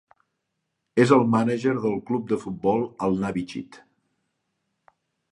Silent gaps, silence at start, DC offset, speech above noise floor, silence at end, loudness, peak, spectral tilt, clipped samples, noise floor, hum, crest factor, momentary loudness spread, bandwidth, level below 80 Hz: none; 0.95 s; under 0.1%; 56 dB; 1.55 s; -23 LUFS; -4 dBFS; -7 dB/octave; under 0.1%; -79 dBFS; none; 22 dB; 11 LU; 11 kHz; -60 dBFS